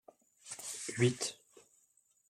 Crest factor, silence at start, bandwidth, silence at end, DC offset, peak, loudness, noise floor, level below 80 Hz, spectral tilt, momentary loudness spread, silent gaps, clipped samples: 22 dB; 0.45 s; 16 kHz; 0.7 s; under 0.1%; -16 dBFS; -36 LUFS; -73 dBFS; -78 dBFS; -4.5 dB/octave; 23 LU; none; under 0.1%